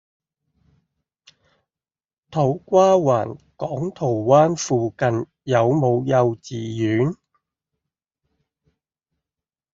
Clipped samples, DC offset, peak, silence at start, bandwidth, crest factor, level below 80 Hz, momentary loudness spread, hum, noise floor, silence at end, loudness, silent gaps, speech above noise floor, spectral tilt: under 0.1%; under 0.1%; -2 dBFS; 2.3 s; 7.6 kHz; 20 dB; -60 dBFS; 13 LU; none; under -90 dBFS; 2.6 s; -20 LUFS; none; over 71 dB; -7 dB/octave